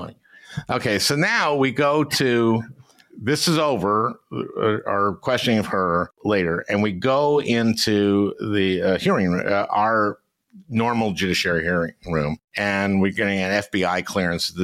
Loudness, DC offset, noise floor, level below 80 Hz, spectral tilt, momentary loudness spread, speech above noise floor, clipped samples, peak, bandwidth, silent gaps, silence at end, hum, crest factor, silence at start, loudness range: -21 LUFS; under 0.1%; -41 dBFS; -52 dBFS; -5 dB/octave; 7 LU; 21 dB; under 0.1%; -8 dBFS; 16 kHz; 12.44-12.48 s; 0 s; none; 12 dB; 0 s; 2 LU